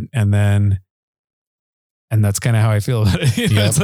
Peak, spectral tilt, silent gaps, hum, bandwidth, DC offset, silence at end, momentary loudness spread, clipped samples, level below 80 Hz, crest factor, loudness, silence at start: 0 dBFS; -5.5 dB/octave; 0.90-2.08 s; none; 14.5 kHz; under 0.1%; 0 s; 4 LU; under 0.1%; -42 dBFS; 16 dB; -16 LUFS; 0 s